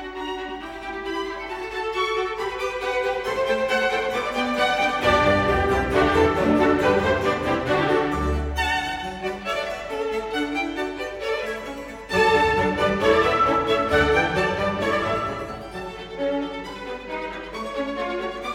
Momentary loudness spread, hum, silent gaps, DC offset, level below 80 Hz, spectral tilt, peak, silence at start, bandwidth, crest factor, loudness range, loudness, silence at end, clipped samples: 13 LU; none; none; under 0.1%; -40 dBFS; -5 dB/octave; -4 dBFS; 0 s; 16.5 kHz; 18 dB; 7 LU; -23 LUFS; 0 s; under 0.1%